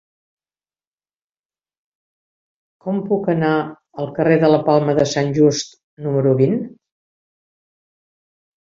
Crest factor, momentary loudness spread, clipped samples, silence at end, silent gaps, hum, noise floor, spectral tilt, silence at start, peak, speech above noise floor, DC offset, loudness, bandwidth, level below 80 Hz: 18 dB; 15 LU; under 0.1%; 2 s; 5.83-5.97 s; none; under -90 dBFS; -6.5 dB/octave; 2.85 s; -2 dBFS; over 73 dB; under 0.1%; -17 LUFS; 7.8 kHz; -60 dBFS